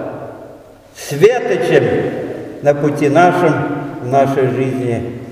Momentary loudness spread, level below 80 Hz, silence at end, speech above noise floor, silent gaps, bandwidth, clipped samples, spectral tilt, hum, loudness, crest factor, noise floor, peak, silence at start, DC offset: 15 LU; -52 dBFS; 0 s; 25 dB; none; 16 kHz; under 0.1%; -6.5 dB/octave; none; -14 LUFS; 14 dB; -39 dBFS; 0 dBFS; 0 s; under 0.1%